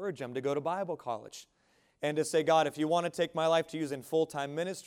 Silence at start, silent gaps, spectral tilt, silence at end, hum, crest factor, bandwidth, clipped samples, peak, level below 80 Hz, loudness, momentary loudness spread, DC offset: 0 s; none; -4.5 dB/octave; 0.05 s; none; 18 dB; 16.5 kHz; under 0.1%; -14 dBFS; -78 dBFS; -32 LUFS; 10 LU; under 0.1%